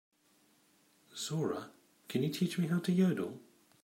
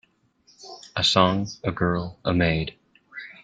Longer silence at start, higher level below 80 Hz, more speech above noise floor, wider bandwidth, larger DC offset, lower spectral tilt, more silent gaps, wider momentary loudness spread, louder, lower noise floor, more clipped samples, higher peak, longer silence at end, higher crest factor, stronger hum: first, 1.15 s vs 0.6 s; second, -78 dBFS vs -48 dBFS; about the same, 37 dB vs 39 dB; first, 16 kHz vs 9.2 kHz; neither; about the same, -6 dB/octave vs -5 dB/octave; neither; second, 17 LU vs 22 LU; second, -35 LUFS vs -23 LUFS; first, -70 dBFS vs -61 dBFS; neither; second, -18 dBFS vs -2 dBFS; first, 0.45 s vs 0.1 s; about the same, 18 dB vs 22 dB; neither